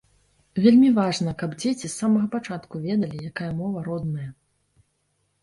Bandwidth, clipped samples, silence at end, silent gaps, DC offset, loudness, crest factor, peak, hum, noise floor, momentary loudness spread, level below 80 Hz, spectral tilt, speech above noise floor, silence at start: 11.5 kHz; under 0.1%; 1.1 s; none; under 0.1%; -23 LUFS; 18 dB; -6 dBFS; none; -71 dBFS; 15 LU; -58 dBFS; -6 dB/octave; 49 dB; 0.55 s